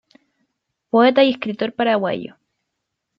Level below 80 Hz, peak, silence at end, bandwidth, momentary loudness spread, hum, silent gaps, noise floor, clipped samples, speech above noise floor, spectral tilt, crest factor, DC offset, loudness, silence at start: -68 dBFS; -2 dBFS; 0.9 s; 5.8 kHz; 12 LU; none; none; -78 dBFS; under 0.1%; 61 dB; -7.5 dB/octave; 18 dB; under 0.1%; -18 LUFS; 0.95 s